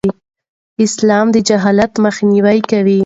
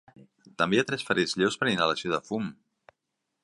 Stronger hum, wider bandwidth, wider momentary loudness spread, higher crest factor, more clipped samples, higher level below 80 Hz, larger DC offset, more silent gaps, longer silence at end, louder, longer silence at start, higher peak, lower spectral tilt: neither; second, 8 kHz vs 11.5 kHz; about the same, 6 LU vs 8 LU; second, 12 dB vs 20 dB; neither; first, -48 dBFS vs -66 dBFS; neither; first, 0.49-0.76 s vs none; second, 0 s vs 0.9 s; first, -12 LUFS vs -27 LUFS; second, 0.05 s vs 0.45 s; first, 0 dBFS vs -8 dBFS; about the same, -5.5 dB/octave vs -4.5 dB/octave